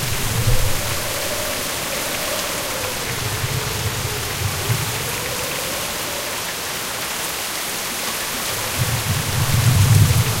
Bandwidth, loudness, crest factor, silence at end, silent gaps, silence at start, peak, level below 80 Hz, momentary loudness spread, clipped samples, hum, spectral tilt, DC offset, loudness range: 16 kHz; -20 LUFS; 18 dB; 0 s; none; 0 s; -4 dBFS; -32 dBFS; 6 LU; under 0.1%; none; -3.5 dB/octave; under 0.1%; 3 LU